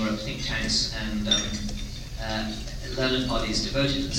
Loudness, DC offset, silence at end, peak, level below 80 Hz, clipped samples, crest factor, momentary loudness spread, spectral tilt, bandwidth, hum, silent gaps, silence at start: -27 LUFS; under 0.1%; 0 s; -8 dBFS; -36 dBFS; under 0.1%; 18 dB; 11 LU; -3.5 dB/octave; 16 kHz; none; none; 0 s